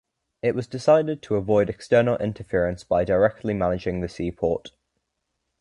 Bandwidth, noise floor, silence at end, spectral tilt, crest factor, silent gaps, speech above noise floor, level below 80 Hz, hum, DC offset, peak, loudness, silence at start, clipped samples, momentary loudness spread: 11 kHz; -78 dBFS; 0.9 s; -7 dB/octave; 18 dB; none; 56 dB; -46 dBFS; none; under 0.1%; -6 dBFS; -23 LUFS; 0.45 s; under 0.1%; 8 LU